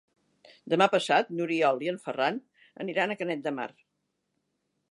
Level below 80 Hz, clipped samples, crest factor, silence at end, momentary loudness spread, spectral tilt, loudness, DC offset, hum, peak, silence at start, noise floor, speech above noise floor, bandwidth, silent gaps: -84 dBFS; under 0.1%; 22 dB; 1.25 s; 13 LU; -5 dB/octave; -28 LUFS; under 0.1%; none; -6 dBFS; 0.65 s; -79 dBFS; 51 dB; 11.5 kHz; none